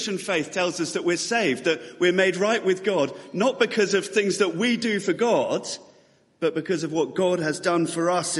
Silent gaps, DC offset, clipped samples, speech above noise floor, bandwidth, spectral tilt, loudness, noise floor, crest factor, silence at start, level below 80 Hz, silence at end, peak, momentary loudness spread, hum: none; under 0.1%; under 0.1%; 35 dB; 11.5 kHz; -4 dB/octave; -23 LUFS; -58 dBFS; 16 dB; 0 s; -72 dBFS; 0 s; -8 dBFS; 6 LU; none